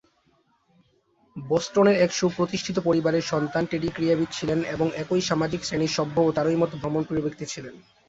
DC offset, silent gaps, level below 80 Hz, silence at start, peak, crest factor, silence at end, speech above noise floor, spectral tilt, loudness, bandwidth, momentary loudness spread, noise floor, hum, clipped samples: under 0.1%; none; -56 dBFS; 1.35 s; -8 dBFS; 18 dB; 0.3 s; 42 dB; -5.5 dB/octave; -24 LUFS; 8 kHz; 9 LU; -66 dBFS; none; under 0.1%